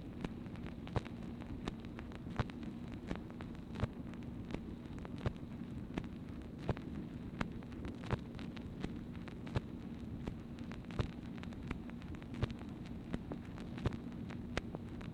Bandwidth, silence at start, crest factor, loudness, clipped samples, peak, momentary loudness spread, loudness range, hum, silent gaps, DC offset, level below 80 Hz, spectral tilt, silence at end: 15 kHz; 0 s; 26 dB; -45 LUFS; under 0.1%; -18 dBFS; 5 LU; 1 LU; none; none; under 0.1%; -52 dBFS; -7.5 dB/octave; 0 s